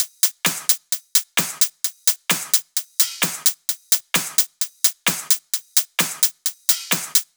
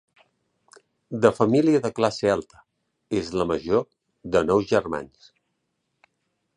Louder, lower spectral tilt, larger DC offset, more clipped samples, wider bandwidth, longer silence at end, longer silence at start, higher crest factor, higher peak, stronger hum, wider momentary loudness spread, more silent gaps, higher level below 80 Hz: first, -19 LUFS vs -23 LUFS; second, 0 dB/octave vs -6.5 dB/octave; neither; neither; first, over 20 kHz vs 10.5 kHz; second, 0.15 s vs 1.5 s; second, 0 s vs 1.1 s; about the same, 22 dB vs 22 dB; first, 0 dBFS vs -4 dBFS; neither; second, 3 LU vs 14 LU; neither; second, -88 dBFS vs -54 dBFS